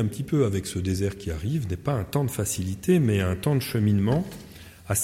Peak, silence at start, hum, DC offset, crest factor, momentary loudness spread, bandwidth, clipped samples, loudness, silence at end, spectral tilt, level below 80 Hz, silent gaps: -10 dBFS; 0 s; none; under 0.1%; 16 dB; 8 LU; 16.5 kHz; under 0.1%; -25 LUFS; 0 s; -6 dB/octave; -46 dBFS; none